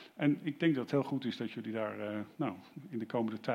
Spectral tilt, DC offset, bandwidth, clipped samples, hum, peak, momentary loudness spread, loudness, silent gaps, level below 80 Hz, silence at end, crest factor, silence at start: -7.5 dB/octave; under 0.1%; 12.5 kHz; under 0.1%; none; -18 dBFS; 8 LU; -36 LUFS; none; -86 dBFS; 0 s; 18 dB; 0 s